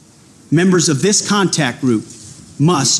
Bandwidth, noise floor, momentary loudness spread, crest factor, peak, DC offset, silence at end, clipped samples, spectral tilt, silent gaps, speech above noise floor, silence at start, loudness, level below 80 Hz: 13 kHz; -45 dBFS; 17 LU; 12 dB; -4 dBFS; under 0.1%; 0 s; under 0.1%; -4 dB/octave; none; 31 dB; 0.5 s; -14 LUFS; -54 dBFS